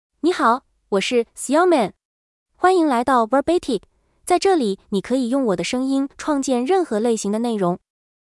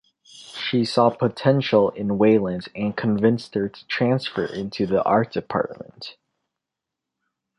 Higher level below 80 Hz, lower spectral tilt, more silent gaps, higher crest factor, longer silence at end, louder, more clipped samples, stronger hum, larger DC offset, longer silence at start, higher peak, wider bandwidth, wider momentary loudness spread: about the same, -56 dBFS vs -58 dBFS; second, -4.5 dB/octave vs -7 dB/octave; first, 2.05-2.46 s vs none; about the same, 16 dB vs 18 dB; second, 0.55 s vs 1.45 s; about the same, -20 LUFS vs -22 LUFS; neither; neither; neither; about the same, 0.25 s vs 0.35 s; about the same, -4 dBFS vs -4 dBFS; about the same, 12 kHz vs 11.5 kHz; second, 7 LU vs 12 LU